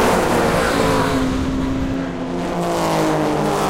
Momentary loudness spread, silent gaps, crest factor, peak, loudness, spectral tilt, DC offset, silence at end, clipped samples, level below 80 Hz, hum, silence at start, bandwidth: 6 LU; none; 14 dB; -4 dBFS; -19 LUFS; -5.5 dB/octave; under 0.1%; 0 s; under 0.1%; -32 dBFS; none; 0 s; 16.5 kHz